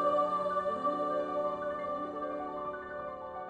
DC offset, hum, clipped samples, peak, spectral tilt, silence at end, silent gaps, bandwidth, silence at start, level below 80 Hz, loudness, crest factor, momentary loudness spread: under 0.1%; none; under 0.1%; -18 dBFS; -6.5 dB/octave; 0 s; none; 9.4 kHz; 0 s; -66 dBFS; -34 LUFS; 16 dB; 10 LU